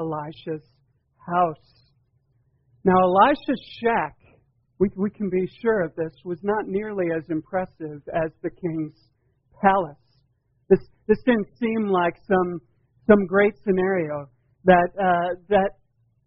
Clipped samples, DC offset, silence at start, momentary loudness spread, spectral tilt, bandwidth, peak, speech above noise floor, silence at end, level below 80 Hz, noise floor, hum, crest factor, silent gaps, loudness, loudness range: under 0.1%; under 0.1%; 0 s; 14 LU; -5.5 dB/octave; 5.6 kHz; -2 dBFS; 44 dB; 0.55 s; -52 dBFS; -67 dBFS; none; 22 dB; none; -23 LUFS; 6 LU